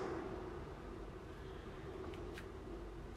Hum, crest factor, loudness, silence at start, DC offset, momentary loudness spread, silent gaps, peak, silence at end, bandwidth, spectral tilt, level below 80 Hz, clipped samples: none; 16 dB; -49 LUFS; 0 s; under 0.1%; 5 LU; none; -32 dBFS; 0 s; 15 kHz; -6.5 dB/octave; -56 dBFS; under 0.1%